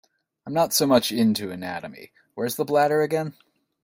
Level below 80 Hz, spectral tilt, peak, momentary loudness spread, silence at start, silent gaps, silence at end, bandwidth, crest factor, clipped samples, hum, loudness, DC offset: -64 dBFS; -4 dB/octave; -4 dBFS; 16 LU; 0.45 s; none; 0.5 s; 16.5 kHz; 20 dB; under 0.1%; none; -23 LUFS; under 0.1%